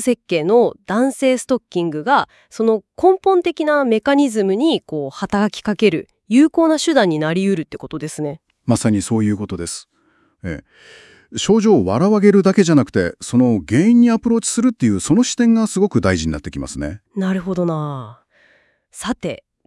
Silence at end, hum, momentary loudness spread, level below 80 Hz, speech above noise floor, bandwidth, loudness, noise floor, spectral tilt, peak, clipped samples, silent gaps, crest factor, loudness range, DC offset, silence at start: 0.3 s; none; 14 LU; -48 dBFS; 43 dB; 12 kHz; -17 LUFS; -59 dBFS; -5.5 dB/octave; 0 dBFS; under 0.1%; none; 16 dB; 8 LU; under 0.1%; 0 s